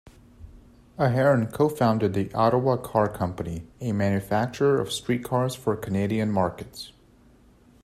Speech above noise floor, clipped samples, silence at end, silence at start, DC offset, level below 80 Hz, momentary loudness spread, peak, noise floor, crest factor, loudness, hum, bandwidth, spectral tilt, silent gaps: 31 dB; under 0.1%; 0.95 s; 0.05 s; under 0.1%; -54 dBFS; 12 LU; -6 dBFS; -56 dBFS; 18 dB; -25 LUFS; none; 15 kHz; -6.5 dB/octave; none